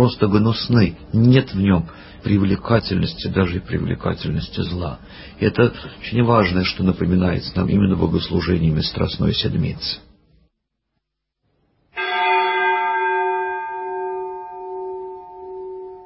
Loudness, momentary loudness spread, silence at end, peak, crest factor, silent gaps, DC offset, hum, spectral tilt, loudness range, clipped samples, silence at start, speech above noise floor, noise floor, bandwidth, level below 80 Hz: -19 LUFS; 15 LU; 0 s; 0 dBFS; 20 dB; none; under 0.1%; none; -10.5 dB/octave; 6 LU; under 0.1%; 0 s; 58 dB; -76 dBFS; 5.8 kHz; -36 dBFS